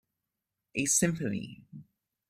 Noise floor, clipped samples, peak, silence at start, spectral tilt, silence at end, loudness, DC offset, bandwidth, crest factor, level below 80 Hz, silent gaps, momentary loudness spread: -87 dBFS; under 0.1%; -12 dBFS; 0.75 s; -3.5 dB/octave; 0.45 s; -29 LUFS; under 0.1%; 15.5 kHz; 22 dB; -64 dBFS; none; 19 LU